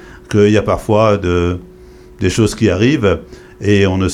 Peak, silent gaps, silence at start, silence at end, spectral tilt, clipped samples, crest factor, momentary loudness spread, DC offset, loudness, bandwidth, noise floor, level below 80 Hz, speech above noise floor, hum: 0 dBFS; none; 0.05 s; 0 s; -6.5 dB/octave; under 0.1%; 12 dB; 8 LU; under 0.1%; -14 LUFS; 13.5 kHz; -38 dBFS; -36 dBFS; 26 dB; none